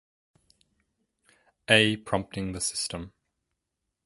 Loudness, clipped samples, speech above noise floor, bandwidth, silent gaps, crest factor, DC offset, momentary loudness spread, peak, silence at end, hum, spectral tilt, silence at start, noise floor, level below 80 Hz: -25 LUFS; under 0.1%; 57 dB; 12 kHz; none; 28 dB; under 0.1%; 21 LU; -4 dBFS; 0.95 s; none; -3 dB/octave; 1.7 s; -83 dBFS; -56 dBFS